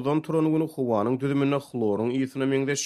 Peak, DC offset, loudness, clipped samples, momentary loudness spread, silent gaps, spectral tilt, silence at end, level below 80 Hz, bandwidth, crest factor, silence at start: -12 dBFS; under 0.1%; -25 LUFS; under 0.1%; 3 LU; none; -6 dB/octave; 0 s; -68 dBFS; 13 kHz; 14 dB; 0 s